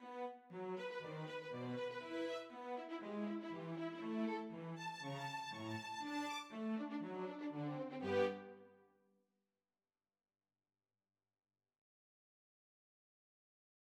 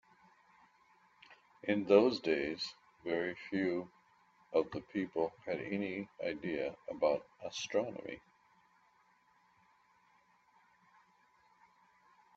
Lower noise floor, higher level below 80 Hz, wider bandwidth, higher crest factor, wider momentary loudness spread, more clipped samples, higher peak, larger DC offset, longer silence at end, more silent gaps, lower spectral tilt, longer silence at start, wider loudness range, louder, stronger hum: first, under -90 dBFS vs -70 dBFS; second, under -90 dBFS vs -76 dBFS; first, 16 kHz vs 7.8 kHz; about the same, 22 dB vs 26 dB; second, 7 LU vs 14 LU; neither; second, -26 dBFS vs -12 dBFS; neither; first, 5.05 s vs 4.2 s; neither; about the same, -5.5 dB/octave vs -5 dB/octave; second, 0 s vs 1.3 s; second, 3 LU vs 10 LU; second, -45 LUFS vs -36 LUFS; neither